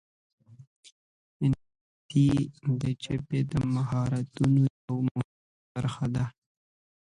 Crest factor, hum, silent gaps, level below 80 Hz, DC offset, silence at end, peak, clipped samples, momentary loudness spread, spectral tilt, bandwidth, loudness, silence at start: 18 dB; none; 0.67-0.83 s, 0.92-1.40 s, 1.81-2.09 s, 4.70-4.88 s, 5.11-5.15 s, 5.25-5.75 s; -54 dBFS; under 0.1%; 0.75 s; -12 dBFS; under 0.1%; 10 LU; -8 dB/octave; 11 kHz; -29 LUFS; 0.5 s